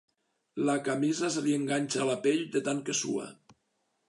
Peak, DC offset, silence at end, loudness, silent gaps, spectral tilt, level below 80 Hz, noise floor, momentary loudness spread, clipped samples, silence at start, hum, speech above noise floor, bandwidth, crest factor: -16 dBFS; under 0.1%; 0.55 s; -30 LUFS; none; -4 dB/octave; -82 dBFS; -77 dBFS; 6 LU; under 0.1%; 0.55 s; none; 48 dB; 11.5 kHz; 16 dB